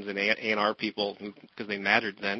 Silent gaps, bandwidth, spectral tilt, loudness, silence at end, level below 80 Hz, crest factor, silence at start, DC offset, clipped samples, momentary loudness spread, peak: none; 6.4 kHz; -4.5 dB/octave; -27 LUFS; 0 s; -74 dBFS; 22 dB; 0 s; under 0.1%; under 0.1%; 17 LU; -6 dBFS